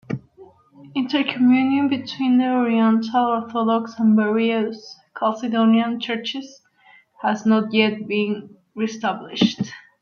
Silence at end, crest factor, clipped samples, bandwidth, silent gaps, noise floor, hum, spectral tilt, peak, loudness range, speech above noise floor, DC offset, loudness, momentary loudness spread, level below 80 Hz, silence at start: 0.2 s; 18 dB; under 0.1%; 6.8 kHz; none; -53 dBFS; none; -6 dB/octave; -2 dBFS; 4 LU; 34 dB; under 0.1%; -20 LUFS; 12 LU; -66 dBFS; 0.1 s